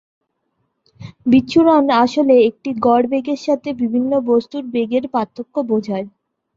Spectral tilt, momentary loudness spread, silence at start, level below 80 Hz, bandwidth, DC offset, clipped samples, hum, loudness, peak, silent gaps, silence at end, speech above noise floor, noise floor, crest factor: -6.5 dB/octave; 11 LU; 1 s; -56 dBFS; 7.6 kHz; under 0.1%; under 0.1%; none; -16 LUFS; -2 dBFS; none; 0.5 s; 54 dB; -69 dBFS; 14 dB